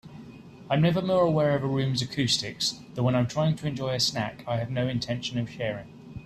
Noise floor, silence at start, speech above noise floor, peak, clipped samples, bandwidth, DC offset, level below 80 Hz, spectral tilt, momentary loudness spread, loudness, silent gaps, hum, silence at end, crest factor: -46 dBFS; 0.05 s; 19 dB; -10 dBFS; under 0.1%; 13.5 kHz; under 0.1%; -58 dBFS; -5 dB/octave; 9 LU; -27 LUFS; none; none; 0 s; 16 dB